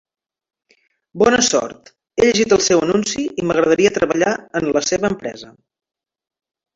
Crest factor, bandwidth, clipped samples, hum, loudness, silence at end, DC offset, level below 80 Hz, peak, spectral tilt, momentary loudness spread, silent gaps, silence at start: 18 dB; 8 kHz; under 0.1%; none; -16 LUFS; 1.3 s; under 0.1%; -50 dBFS; -2 dBFS; -3.5 dB/octave; 12 LU; none; 1.15 s